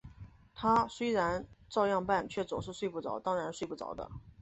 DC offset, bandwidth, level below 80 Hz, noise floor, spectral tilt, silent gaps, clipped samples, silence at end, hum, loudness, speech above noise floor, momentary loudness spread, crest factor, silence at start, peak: under 0.1%; 8.2 kHz; -58 dBFS; -54 dBFS; -5.5 dB/octave; none; under 0.1%; 0.1 s; none; -34 LUFS; 20 dB; 13 LU; 18 dB; 0.05 s; -16 dBFS